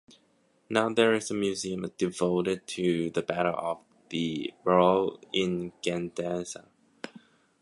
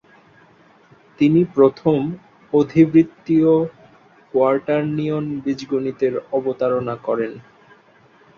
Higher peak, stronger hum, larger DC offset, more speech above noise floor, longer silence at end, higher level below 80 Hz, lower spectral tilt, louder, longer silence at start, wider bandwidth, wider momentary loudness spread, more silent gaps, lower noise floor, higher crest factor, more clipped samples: second, -6 dBFS vs -2 dBFS; neither; neither; first, 39 dB vs 34 dB; second, 0.45 s vs 0.95 s; about the same, -64 dBFS vs -60 dBFS; second, -5 dB/octave vs -9 dB/octave; second, -28 LUFS vs -19 LUFS; second, 0.7 s vs 1.2 s; first, 11.5 kHz vs 6.8 kHz; first, 14 LU vs 10 LU; neither; first, -67 dBFS vs -52 dBFS; about the same, 22 dB vs 18 dB; neither